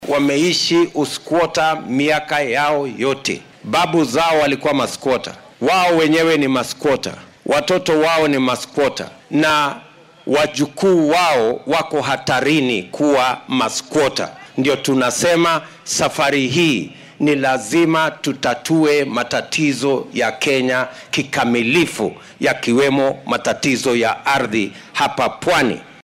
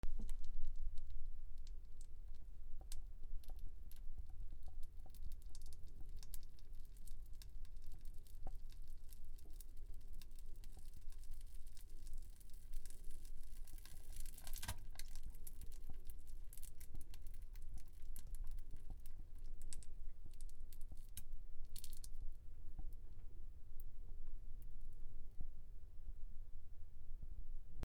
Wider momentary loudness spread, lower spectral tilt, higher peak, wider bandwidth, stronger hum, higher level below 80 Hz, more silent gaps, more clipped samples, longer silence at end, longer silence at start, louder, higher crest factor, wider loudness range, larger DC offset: about the same, 7 LU vs 6 LU; about the same, -4 dB/octave vs -4 dB/octave; first, -6 dBFS vs -24 dBFS; first, 16 kHz vs 14 kHz; neither; second, -54 dBFS vs -48 dBFS; neither; neither; first, 0.2 s vs 0 s; about the same, 0 s vs 0.05 s; first, -17 LUFS vs -58 LUFS; second, 10 dB vs 16 dB; second, 1 LU vs 4 LU; neither